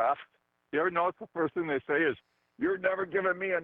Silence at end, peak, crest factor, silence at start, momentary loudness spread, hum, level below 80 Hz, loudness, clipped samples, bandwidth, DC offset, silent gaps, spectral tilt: 0 s; -14 dBFS; 16 dB; 0 s; 6 LU; none; -72 dBFS; -31 LUFS; under 0.1%; 4.2 kHz; under 0.1%; none; -3.5 dB/octave